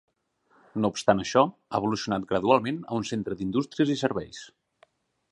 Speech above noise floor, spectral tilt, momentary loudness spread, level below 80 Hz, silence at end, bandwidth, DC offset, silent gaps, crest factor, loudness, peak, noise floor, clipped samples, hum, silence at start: 41 dB; -5.5 dB/octave; 9 LU; -60 dBFS; 0.85 s; 11.5 kHz; under 0.1%; none; 22 dB; -26 LUFS; -4 dBFS; -67 dBFS; under 0.1%; none; 0.75 s